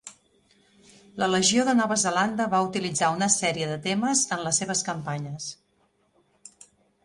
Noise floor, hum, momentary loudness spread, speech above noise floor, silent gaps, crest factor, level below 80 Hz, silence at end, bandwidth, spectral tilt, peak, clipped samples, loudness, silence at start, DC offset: -68 dBFS; none; 12 LU; 43 dB; none; 20 dB; -66 dBFS; 1.5 s; 11.5 kHz; -3 dB/octave; -6 dBFS; under 0.1%; -24 LUFS; 0.05 s; under 0.1%